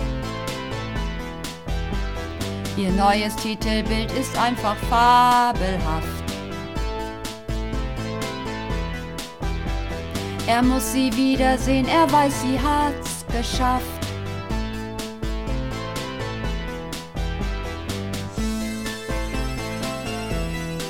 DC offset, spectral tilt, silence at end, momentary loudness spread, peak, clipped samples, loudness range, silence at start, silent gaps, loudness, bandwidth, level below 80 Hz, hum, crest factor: under 0.1%; -5 dB/octave; 0 s; 11 LU; -6 dBFS; under 0.1%; 9 LU; 0 s; none; -24 LUFS; 17.5 kHz; -32 dBFS; none; 18 dB